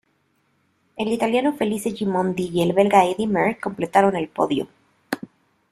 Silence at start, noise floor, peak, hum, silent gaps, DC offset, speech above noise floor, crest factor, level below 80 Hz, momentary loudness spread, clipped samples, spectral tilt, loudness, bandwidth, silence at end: 0.95 s; -66 dBFS; -2 dBFS; none; none; under 0.1%; 46 dB; 20 dB; -60 dBFS; 15 LU; under 0.1%; -6 dB/octave; -21 LUFS; 14.5 kHz; 0.45 s